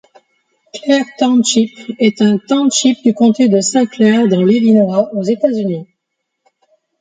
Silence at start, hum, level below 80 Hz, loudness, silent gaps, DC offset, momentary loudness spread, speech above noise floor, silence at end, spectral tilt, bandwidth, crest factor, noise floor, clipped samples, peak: 0.75 s; none; -62 dBFS; -13 LUFS; none; under 0.1%; 8 LU; 62 dB; 1.15 s; -5 dB/octave; 9.6 kHz; 12 dB; -74 dBFS; under 0.1%; 0 dBFS